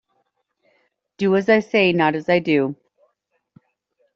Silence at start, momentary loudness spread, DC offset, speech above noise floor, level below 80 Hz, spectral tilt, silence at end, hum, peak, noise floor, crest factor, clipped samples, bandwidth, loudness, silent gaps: 1.2 s; 9 LU; under 0.1%; 53 dB; -64 dBFS; -4 dB/octave; 1.4 s; none; -4 dBFS; -71 dBFS; 18 dB; under 0.1%; 7.4 kHz; -18 LUFS; none